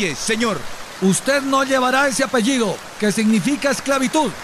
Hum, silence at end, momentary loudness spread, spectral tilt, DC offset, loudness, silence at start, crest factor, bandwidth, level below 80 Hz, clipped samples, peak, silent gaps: none; 0 s; 6 LU; -4 dB/octave; under 0.1%; -18 LUFS; 0 s; 12 dB; 14.5 kHz; -52 dBFS; under 0.1%; -6 dBFS; none